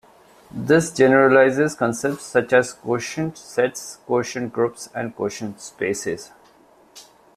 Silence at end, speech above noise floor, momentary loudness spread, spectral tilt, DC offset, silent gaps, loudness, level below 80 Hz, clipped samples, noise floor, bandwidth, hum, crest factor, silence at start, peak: 0.35 s; 33 dB; 15 LU; -5 dB/octave; under 0.1%; none; -20 LUFS; -60 dBFS; under 0.1%; -53 dBFS; 14.5 kHz; none; 20 dB; 0.55 s; -2 dBFS